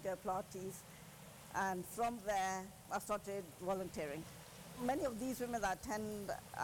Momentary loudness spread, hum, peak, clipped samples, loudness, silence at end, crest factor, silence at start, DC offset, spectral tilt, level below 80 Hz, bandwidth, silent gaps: 14 LU; none; -28 dBFS; under 0.1%; -42 LUFS; 0 s; 14 dB; 0 s; under 0.1%; -4.5 dB/octave; -66 dBFS; 17 kHz; none